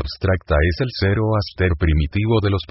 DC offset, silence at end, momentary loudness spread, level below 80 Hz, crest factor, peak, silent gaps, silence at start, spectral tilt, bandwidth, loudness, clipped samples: under 0.1%; 0.05 s; 3 LU; -26 dBFS; 14 dB; -4 dBFS; none; 0 s; -10.5 dB/octave; 5.8 kHz; -19 LUFS; under 0.1%